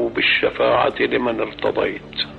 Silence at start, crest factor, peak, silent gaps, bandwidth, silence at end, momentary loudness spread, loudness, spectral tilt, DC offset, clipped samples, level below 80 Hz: 0 s; 14 dB; -6 dBFS; none; 7.2 kHz; 0 s; 7 LU; -19 LUFS; -6.5 dB/octave; under 0.1%; under 0.1%; -48 dBFS